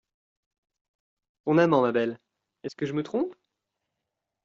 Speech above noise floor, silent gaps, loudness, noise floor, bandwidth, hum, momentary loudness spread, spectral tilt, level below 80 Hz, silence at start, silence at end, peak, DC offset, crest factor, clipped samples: 60 dB; none; -26 LUFS; -85 dBFS; 7.4 kHz; none; 19 LU; -6 dB/octave; -74 dBFS; 1.45 s; 1.1 s; -8 dBFS; under 0.1%; 22 dB; under 0.1%